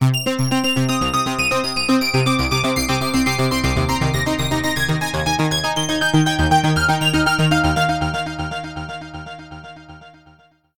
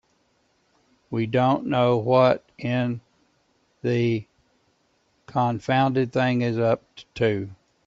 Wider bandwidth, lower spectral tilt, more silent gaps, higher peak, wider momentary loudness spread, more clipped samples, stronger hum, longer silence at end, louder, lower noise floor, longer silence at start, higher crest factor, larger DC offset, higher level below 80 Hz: first, 19.5 kHz vs 7.6 kHz; second, -4.5 dB/octave vs -8 dB/octave; neither; about the same, -4 dBFS vs -6 dBFS; about the same, 13 LU vs 11 LU; neither; neither; second, 0 s vs 0.35 s; first, -18 LUFS vs -23 LUFS; second, -52 dBFS vs -67 dBFS; second, 0 s vs 1.1 s; about the same, 16 dB vs 20 dB; first, 1% vs under 0.1%; first, -34 dBFS vs -62 dBFS